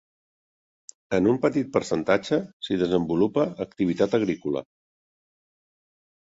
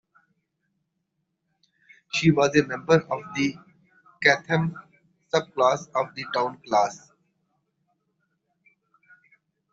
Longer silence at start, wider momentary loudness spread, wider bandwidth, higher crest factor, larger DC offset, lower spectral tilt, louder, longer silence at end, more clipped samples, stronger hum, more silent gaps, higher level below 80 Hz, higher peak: second, 1.1 s vs 2.15 s; second, 6 LU vs 9 LU; about the same, 8 kHz vs 7.8 kHz; about the same, 20 dB vs 24 dB; neither; first, -6.5 dB/octave vs -5 dB/octave; about the same, -25 LUFS vs -24 LUFS; second, 1.6 s vs 2.75 s; neither; neither; first, 2.53-2.60 s vs none; first, -58 dBFS vs -64 dBFS; about the same, -6 dBFS vs -4 dBFS